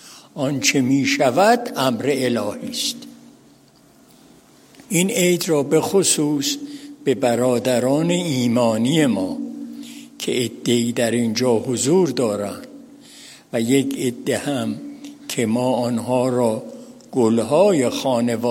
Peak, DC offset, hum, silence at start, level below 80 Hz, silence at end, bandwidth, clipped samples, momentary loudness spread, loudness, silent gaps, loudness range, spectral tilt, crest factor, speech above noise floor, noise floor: -2 dBFS; under 0.1%; none; 0.05 s; -66 dBFS; 0 s; 16.5 kHz; under 0.1%; 13 LU; -19 LUFS; none; 5 LU; -4.5 dB/octave; 18 dB; 33 dB; -51 dBFS